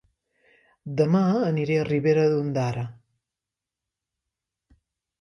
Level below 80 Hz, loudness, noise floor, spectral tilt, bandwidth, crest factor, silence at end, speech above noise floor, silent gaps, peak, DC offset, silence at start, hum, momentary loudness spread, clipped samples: -62 dBFS; -23 LUFS; -88 dBFS; -8 dB/octave; 9.8 kHz; 18 dB; 2.25 s; 66 dB; none; -8 dBFS; under 0.1%; 0.85 s; none; 13 LU; under 0.1%